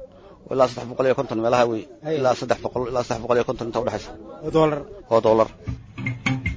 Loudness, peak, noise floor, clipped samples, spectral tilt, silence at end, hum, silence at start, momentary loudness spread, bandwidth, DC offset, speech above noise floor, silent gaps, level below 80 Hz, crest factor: -23 LUFS; -4 dBFS; -44 dBFS; under 0.1%; -6 dB/octave; 0 s; none; 0 s; 11 LU; 8 kHz; under 0.1%; 22 dB; none; -44 dBFS; 18 dB